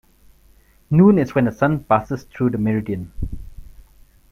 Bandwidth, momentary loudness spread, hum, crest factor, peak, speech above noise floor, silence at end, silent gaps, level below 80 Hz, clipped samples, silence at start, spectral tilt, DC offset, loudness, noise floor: 13.5 kHz; 18 LU; none; 18 dB; -2 dBFS; 35 dB; 0.7 s; none; -38 dBFS; under 0.1%; 0.9 s; -9.5 dB/octave; under 0.1%; -18 LUFS; -53 dBFS